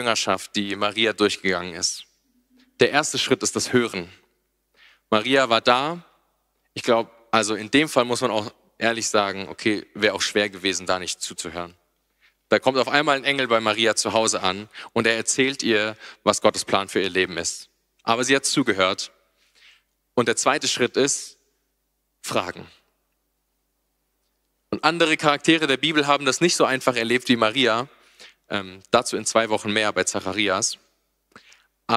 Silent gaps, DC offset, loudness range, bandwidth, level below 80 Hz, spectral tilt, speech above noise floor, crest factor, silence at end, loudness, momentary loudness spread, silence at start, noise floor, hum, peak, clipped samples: none; under 0.1%; 4 LU; 15.5 kHz; -64 dBFS; -2.5 dB/octave; 51 dB; 22 dB; 0 s; -21 LUFS; 11 LU; 0 s; -73 dBFS; none; 0 dBFS; under 0.1%